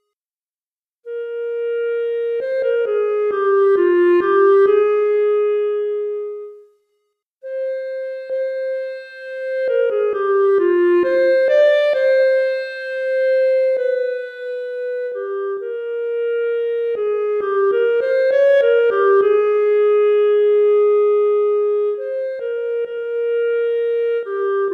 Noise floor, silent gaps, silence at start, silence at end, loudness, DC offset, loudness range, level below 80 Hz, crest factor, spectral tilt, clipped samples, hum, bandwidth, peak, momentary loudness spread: under -90 dBFS; 7.22-7.38 s; 1.05 s; 0 s; -17 LUFS; under 0.1%; 8 LU; -70 dBFS; 12 dB; -5 dB/octave; under 0.1%; none; 5 kHz; -4 dBFS; 11 LU